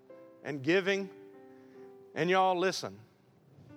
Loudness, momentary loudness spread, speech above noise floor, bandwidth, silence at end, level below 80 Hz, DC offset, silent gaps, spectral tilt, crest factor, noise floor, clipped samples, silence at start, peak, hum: -30 LUFS; 26 LU; 32 dB; 14.5 kHz; 0 s; -84 dBFS; under 0.1%; none; -4.5 dB/octave; 18 dB; -62 dBFS; under 0.1%; 0.1 s; -16 dBFS; none